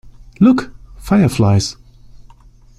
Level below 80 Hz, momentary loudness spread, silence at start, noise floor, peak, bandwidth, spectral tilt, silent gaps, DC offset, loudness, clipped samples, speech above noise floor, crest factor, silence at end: -38 dBFS; 17 LU; 0.4 s; -43 dBFS; -2 dBFS; 14 kHz; -6.5 dB/octave; none; under 0.1%; -14 LUFS; under 0.1%; 31 dB; 14 dB; 1.05 s